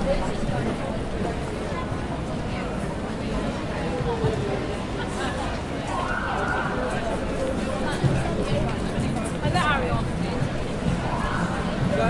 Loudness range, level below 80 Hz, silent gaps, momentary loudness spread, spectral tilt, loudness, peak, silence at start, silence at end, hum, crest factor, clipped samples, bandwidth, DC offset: 3 LU; -34 dBFS; none; 5 LU; -6 dB/octave; -27 LUFS; -10 dBFS; 0 s; 0 s; none; 16 dB; under 0.1%; 11.5 kHz; under 0.1%